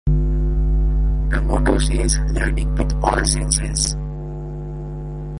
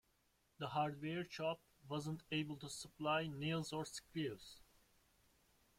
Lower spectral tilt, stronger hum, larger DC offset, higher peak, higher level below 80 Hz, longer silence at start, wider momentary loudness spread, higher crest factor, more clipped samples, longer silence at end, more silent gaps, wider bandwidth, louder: about the same, -4.5 dB/octave vs -5 dB/octave; first, 50 Hz at -20 dBFS vs none; neither; first, 0 dBFS vs -28 dBFS; first, -20 dBFS vs -76 dBFS; second, 0.05 s vs 0.6 s; about the same, 12 LU vs 10 LU; about the same, 18 dB vs 18 dB; neither; second, 0 s vs 1.15 s; neither; second, 11.5 kHz vs 16 kHz; first, -21 LUFS vs -44 LUFS